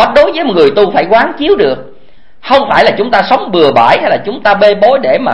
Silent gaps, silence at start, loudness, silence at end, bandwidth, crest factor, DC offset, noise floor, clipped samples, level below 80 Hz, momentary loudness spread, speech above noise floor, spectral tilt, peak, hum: none; 0 s; -8 LUFS; 0 s; 11 kHz; 8 dB; 4%; -45 dBFS; 1%; -40 dBFS; 5 LU; 37 dB; -6 dB/octave; 0 dBFS; none